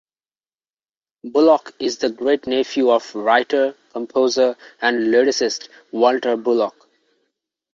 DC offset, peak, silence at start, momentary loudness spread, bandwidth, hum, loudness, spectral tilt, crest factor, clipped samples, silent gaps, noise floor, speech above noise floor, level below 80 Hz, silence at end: under 0.1%; -2 dBFS; 1.25 s; 8 LU; 7.6 kHz; none; -18 LUFS; -3 dB/octave; 18 dB; under 0.1%; none; under -90 dBFS; over 72 dB; -66 dBFS; 1.05 s